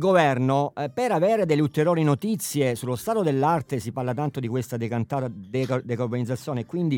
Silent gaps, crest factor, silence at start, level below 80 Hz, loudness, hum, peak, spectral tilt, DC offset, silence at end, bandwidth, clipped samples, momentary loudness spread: none; 18 dB; 0 s; -64 dBFS; -25 LUFS; none; -6 dBFS; -6.5 dB/octave; under 0.1%; 0 s; 18 kHz; under 0.1%; 8 LU